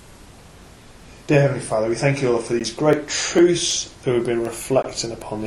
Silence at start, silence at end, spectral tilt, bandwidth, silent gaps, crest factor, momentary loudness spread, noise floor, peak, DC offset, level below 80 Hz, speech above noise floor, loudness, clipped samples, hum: 0.1 s; 0 s; -4.5 dB/octave; 13.5 kHz; none; 18 dB; 8 LU; -44 dBFS; -2 dBFS; under 0.1%; -48 dBFS; 24 dB; -20 LUFS; under 0.1%; none